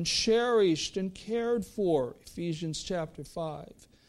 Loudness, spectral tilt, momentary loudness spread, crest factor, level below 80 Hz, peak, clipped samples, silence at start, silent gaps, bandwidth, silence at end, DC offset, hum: -30 LUFS; -4.5 dB/octave; 13 LU; 16 dB; -56 dBFS; -16 dBFS; under 0.1%; 0 s; none; 13.5 kHz; 0.4 s; under 0.1%; none